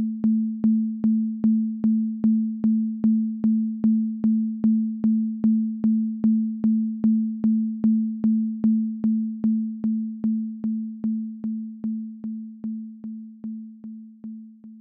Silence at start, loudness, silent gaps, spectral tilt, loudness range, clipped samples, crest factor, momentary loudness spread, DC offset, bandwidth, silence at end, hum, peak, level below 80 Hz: 0 s; -24 LUFS; none; -13.5 dB/octave; 9 LU; under 0.1%; 10 dB; 13 LU; under 0.1%; 1.4 kHz; 0 s; none; -12 dBFS; -64 dBFS